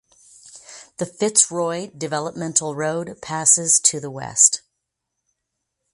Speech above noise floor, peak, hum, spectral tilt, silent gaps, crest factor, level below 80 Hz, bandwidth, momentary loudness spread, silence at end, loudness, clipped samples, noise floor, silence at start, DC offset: 59 dB; 0 dBFS; none; -2 dB/octave; none; 22 dB; -64 dBFS; 12 kHz; 15 LU; 1.35 s; -18 LUFS; under 0.1%; -79 dBFS; 0.45 s; under 0.1%